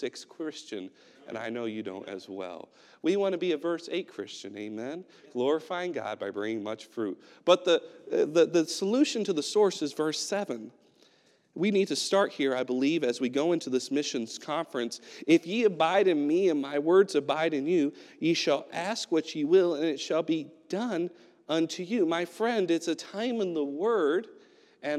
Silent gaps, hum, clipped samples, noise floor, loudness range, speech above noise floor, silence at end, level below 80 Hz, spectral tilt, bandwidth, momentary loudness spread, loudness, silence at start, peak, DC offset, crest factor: none; none; under 0.1%; -65 dBFS; 7 LU; 36 dB; 0 s; under -90 dBFS; -4.5 dB/octave; 13 kHz; 14 LU; -29 LUFS; 0 s; -8 dBFS; under 0.1%; 22 dB